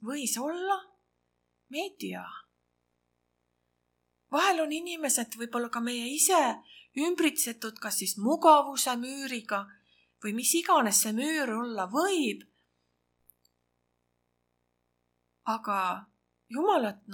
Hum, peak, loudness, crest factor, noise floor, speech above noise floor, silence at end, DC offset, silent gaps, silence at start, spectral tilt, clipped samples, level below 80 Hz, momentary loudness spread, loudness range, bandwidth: 60 Hz at -60 dBFS; -6 dBFS; -28 LUFS; 24 dB; -78 dBFS; 49 dB; 0 s; under 0.1%; none; 0 s; -2 dB/octave; under 0.1%; -84 dBFS; 16 LU; 13 LU; 19 kHz